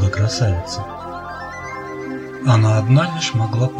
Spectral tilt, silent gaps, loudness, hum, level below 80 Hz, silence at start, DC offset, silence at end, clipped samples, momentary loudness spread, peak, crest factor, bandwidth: -6 dB/octave; none; -19 LUFS; none; -42 dBFS; 0 s; under 0.1%; 0 s; under 0.1%; 15 LU; -2 dBFS; 16 dB; 9.4 kHz